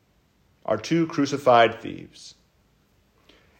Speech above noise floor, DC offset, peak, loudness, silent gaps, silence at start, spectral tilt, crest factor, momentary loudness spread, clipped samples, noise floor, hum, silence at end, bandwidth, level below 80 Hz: 41 dB; under 0.1%; -4 dBFS; -21 LUFS; none; 0.7 s; -5.5 dB/octave; 22 dB; 23 LU; under 0.1%; -64 dBFS; none; 1.3 s; 16 kHz; -66 dBFS